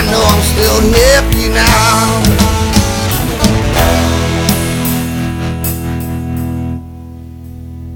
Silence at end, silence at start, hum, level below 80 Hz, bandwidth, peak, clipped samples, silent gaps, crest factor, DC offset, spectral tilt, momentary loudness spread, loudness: 0 s; 0 s; none; -18 dBFS; over 20 kHz; 0 dBFS; 0.1%; none; 12 dB; under 0.1%; -4.5 dB/octave; 18 LU; -11 LUFS